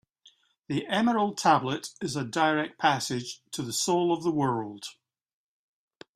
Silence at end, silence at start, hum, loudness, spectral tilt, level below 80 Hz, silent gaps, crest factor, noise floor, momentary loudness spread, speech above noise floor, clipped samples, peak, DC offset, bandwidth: 1.25 s; 0.7 s; none; -27 LUFS; -4 dB/octave; -68 dBFS; none; 20 dB; -62 dBFS; 11 LU; 35 dB; under 0.1%; -8 dBFS; under 0.1%; 15.5 kHz